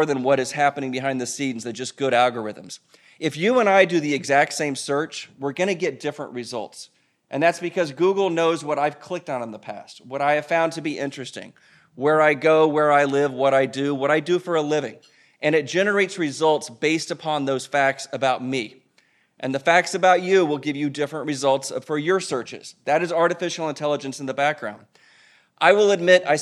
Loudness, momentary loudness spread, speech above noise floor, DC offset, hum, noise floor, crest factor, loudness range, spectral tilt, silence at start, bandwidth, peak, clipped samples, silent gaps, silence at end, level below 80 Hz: -21 LUFS; 15 LU; 41 dB; under 0.1%; none; -62 dBFS; 20 dB; 5 LU; -4.5 dB/octave; 0 s; 13 kHz; -2 dBFS; under 0.1%; none; 0 s; -78 dBFS